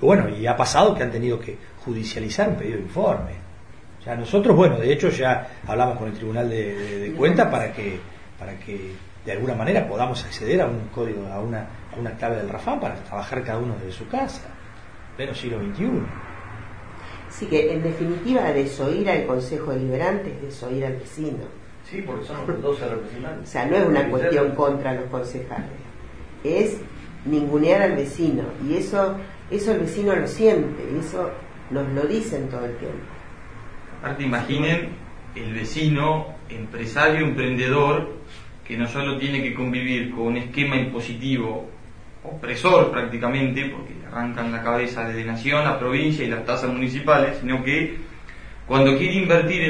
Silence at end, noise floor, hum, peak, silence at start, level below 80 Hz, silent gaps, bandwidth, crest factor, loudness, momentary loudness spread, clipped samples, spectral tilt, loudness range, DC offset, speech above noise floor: 0 s; -45 dBFS; none; -4 dBFS; 0 s; -44 dBFS; none; 10.5 kHz; 20 dB; -23 LUFS; 19 LU; under 0.1%; -6.5 dB/octave; 7 LU; 0.8%; 22 dB